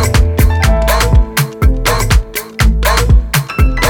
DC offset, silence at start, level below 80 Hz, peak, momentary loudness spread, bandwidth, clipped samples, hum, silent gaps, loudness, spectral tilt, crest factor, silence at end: under 0.1%; 0 s; -12 dBFS; 0 dBFS; 3 LU; 18 kHz; under 0.1%; none; none; -12 LUFS; -4.5 dB/octave; 10 dB; 0 s